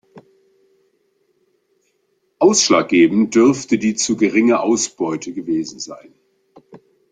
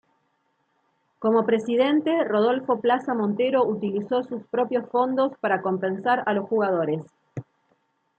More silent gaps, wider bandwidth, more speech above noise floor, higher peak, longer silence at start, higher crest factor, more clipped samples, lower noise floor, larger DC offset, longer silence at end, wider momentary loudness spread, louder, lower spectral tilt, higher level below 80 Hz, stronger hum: neither; first, 9.4 kHz vs 8 kHz; about the same, 50 dB vs 48 dB; first, -2 dBFS vs -8 dBFS; second, 0.15 s vs 1.2 s; about the same, 18 dB vs 16 dB; neither; second, -66 dBFS vs -71 dBFS; neither; second, 0.35 s vs 0.75 s; first, 11 LU vs 7 LU; first, -16 LUFS vs -24 LUFS; second, -3.5 dB/octave vs -7.5 dB/octave; first, -60 dBFS vs -74 dBFS; neither